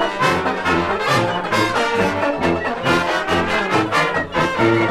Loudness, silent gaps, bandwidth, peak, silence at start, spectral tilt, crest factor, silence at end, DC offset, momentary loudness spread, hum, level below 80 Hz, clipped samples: -18 LUFS; none; 15.5 kHz; -4 dBFS; 0 s; -5 dB/octave; 14 dB; 0 s; under 0.1%; 2 LU; none; -46 dBFS; under 0.1%